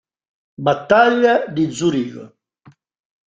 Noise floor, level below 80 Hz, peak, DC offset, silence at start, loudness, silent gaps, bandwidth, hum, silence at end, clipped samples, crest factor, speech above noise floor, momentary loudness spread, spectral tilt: -51 dBFS; -58 dBFS; -2 dBFS; under 0.1%; 0.6 s; -16 LUFS; none; 9.4 kHz; none; 1.1 s; under 0.1%; 18 dB; 35 dB; 12 LU; -5.5 dB/octave